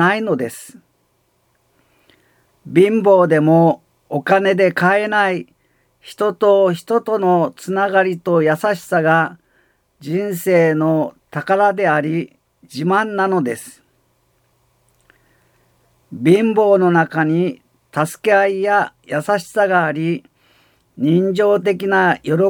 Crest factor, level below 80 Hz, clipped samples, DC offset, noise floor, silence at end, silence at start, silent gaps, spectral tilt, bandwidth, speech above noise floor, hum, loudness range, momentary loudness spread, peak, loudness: 16 dB; -66 dBFS; under 0.1%; under 0.1%; -63 dBFS; 0 s; 0 s; none; -6.5 dB/octave; 19.5 kHz; 47 dB; none; 6 LU; 11 LU; 0 dBFS; -16 LUFS